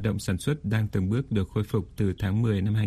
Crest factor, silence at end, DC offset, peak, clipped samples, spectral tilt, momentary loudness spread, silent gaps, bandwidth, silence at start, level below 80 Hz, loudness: 14 dB; 0 s; under 0.1%; -12 dBFS; under 0.1%; -7 dB/octave; 3 LU; none; 13.5 kHz; 0 s; -46 dBFS; -27 LUFS